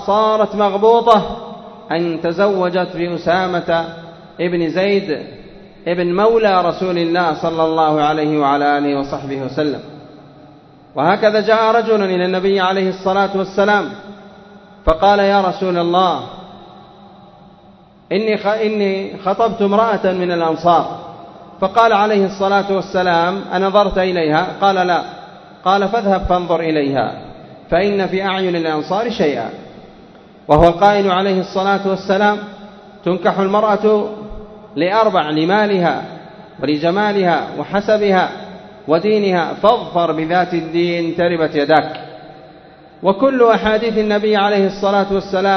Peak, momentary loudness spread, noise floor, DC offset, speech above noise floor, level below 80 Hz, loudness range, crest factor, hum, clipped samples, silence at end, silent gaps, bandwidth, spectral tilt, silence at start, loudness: 0 dBFS; 13 LU; -45 dBFS; under 0.1%; 30 dB; -40 dBFS; 3 LU; 16 dB; none; under 0.1%; 0 s; none; 6.4 kHz; -6.5 dB/octave; 0 s; -15 LUFS